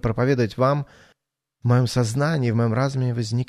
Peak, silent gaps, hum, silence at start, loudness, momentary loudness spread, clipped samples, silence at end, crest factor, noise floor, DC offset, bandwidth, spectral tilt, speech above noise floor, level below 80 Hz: -6 dBFS; none; none; 0.05 s; -22 LUFS; 6 LU; under 0.1%; 0.05 s; 16 dB; -77 dBFS; under 0.1%; 13 kHz; -7 dB/octave; 56 dB; -48 dBFS